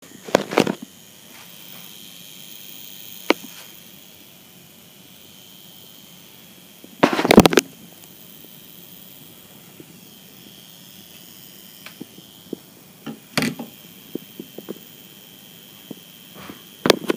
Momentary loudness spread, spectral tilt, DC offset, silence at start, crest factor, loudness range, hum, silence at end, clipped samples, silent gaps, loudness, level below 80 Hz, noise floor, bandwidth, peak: 23 LU; -4 dB/octave; under 0.1%; 0.25 s; 26 dB; 21 LU; none; 0 s; under 0.1%; none; -20 LUFS; -50 dBFS; -46 dBFS; 19.5 kHz; 0 dBFS